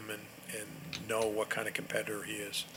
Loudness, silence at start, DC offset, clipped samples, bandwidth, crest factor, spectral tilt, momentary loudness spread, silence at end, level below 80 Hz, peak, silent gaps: -37 LUFS; 0 s; under 0.1%; under 0.1%; 18.5 kHz; 22 dB; -3 dB/octave; 10 LU; 0 s; -74 dBFS; -16 dBFS; none